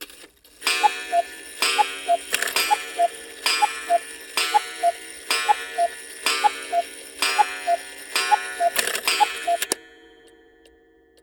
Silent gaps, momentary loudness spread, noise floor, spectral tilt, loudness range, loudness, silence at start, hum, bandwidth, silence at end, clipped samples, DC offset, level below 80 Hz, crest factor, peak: none; 6 LU; -56 dBFS; 1.5 dB/octave; 1 LU; -22 LUFS; 0 s; none; over 20 kHz; 1.35 s; under 0.1%; under 0.1%; -66 dBFS; 22 dB; -2 dBFS